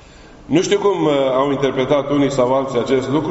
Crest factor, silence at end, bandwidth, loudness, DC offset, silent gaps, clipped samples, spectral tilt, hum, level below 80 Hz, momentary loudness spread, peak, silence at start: 16 dB; 0 s; 8 kHz; -17 LUFS; under 0.1%; none; under 0.1%; -5 dB/octave; none; -46 dBFS; 3 LU; -2 dBFS; 0.35 s